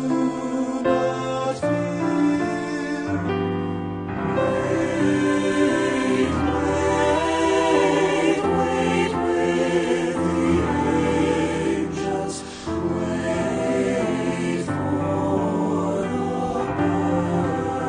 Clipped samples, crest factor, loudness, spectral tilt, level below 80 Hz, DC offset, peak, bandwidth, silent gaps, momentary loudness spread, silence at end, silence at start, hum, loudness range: under 0.1%; 14 dB; -22 LUFS; -6 dB/octave; -48 dBFS; under 0.1%; -8 dBFS; 10.5 kHz; none; 5 LU; 0 s; 0 s; none; 4 LU